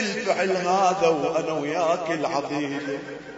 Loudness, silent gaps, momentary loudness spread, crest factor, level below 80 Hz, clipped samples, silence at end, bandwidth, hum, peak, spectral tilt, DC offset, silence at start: -24 LUFS; none; 8 LU; 18 dB; -64 dBFS; under 0.1%; 0 s; 8 kHz; none; -6 dBFS; -4.5 dB/octave; under 0.1%; 0 s